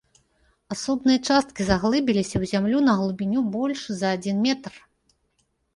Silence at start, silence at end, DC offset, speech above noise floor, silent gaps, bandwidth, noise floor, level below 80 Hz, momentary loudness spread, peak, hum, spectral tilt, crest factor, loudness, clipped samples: 0.7 s; 0.95 s; under 0.1%; 48 dB; none; 11.5 kHz; -71 dBFS; -48 dBFS; 7 LU; -6 dBFS; none; -5 dB/octave; 18 dB; -23 LUFS; under 0.1%